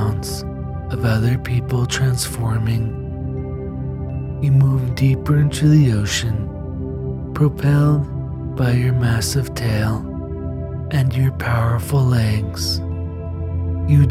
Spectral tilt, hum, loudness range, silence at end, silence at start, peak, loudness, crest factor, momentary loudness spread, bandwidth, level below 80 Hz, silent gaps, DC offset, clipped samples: -6 dB/octave; none; 3 LU; 0 s; 0 s; -2 dBFS; -19 LUFS; 16 dB; 11 LU; 15 kHz; -34 dBFS; none; under 0.1%; under 0.1%